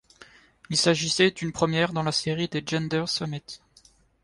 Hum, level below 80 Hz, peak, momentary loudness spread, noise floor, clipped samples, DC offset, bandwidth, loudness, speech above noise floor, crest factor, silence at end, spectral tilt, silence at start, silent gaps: none; -58 dBFS; -8 dBFS; 11 LU; -59 dBFS; under 0.1%; under 0.1%; 11.5 kHz; -25 LUFS; 33 dB; 20 dB; 0.65 s; -4 dB/octave; 0.2 s; none